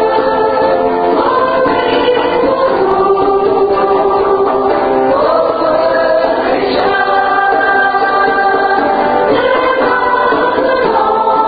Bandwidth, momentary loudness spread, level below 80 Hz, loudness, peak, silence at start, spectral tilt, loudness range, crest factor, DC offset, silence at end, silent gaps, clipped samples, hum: 5 kHz; 1 LU; -42 dBFS; -11 LUFS; 0 dBFS; 0 s; -8 dB/octave; 1 LU; 10 dB; under 0.1%; 0 s; none; under 0.1%; none